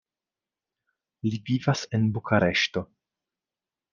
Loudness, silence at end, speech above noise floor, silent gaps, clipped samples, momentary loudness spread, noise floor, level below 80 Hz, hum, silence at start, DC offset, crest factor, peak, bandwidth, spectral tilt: -26 LUFS; 1.1 s; over 65 dB; none; under 0.1%; 10 LU; under -90 dBFS; -64 dBFS; none; 1.25 s; under 0.1%; 22 dB; -8 dBFS; 7.4 kHz; -5.5 dB/octave